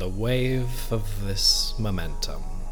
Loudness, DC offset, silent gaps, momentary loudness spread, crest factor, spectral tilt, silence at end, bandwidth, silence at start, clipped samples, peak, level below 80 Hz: -25 LUFS; under 0.1%; none; 12 LU; 16 dB; -4 dB/octave; 0 s; 19.5 kHz; 0 s; under 0.1%; -8 dBFS; -28 dBFS